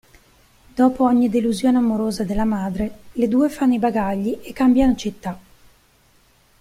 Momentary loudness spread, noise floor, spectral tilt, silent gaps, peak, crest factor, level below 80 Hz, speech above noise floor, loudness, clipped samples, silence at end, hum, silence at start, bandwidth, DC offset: 11 LU; -56 dBFS; -6.5 dB/octave; none; -4 dBFS; 16 dB; -42 dBFS; 38 dB; -19 LUFS; under 0.1%; 1.2 s; none; 0.75 s; 15 kHz; under 0.1%